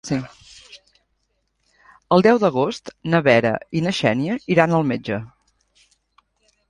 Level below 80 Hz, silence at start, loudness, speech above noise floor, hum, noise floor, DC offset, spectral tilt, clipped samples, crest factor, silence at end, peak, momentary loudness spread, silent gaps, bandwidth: -56 dBFS; 0.05 s; -19 LUFS; 52 dB; none; -70 dBFS; under 0.1%; -6.5 dB/octave; under 0.1%; 20 dB; 1.4 s; -2 dBFS; 12 LU; none; 11 kHz